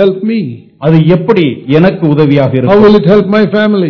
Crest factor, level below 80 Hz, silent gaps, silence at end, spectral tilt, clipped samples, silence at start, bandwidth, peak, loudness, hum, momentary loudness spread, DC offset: 8 dB; -40 dBFS; none; 0 s; -9.5 dB/octave; 6%; 0 s; 6 kHz; 0 dBFS; -8 LUFS; none; 9 LU; under 0.1%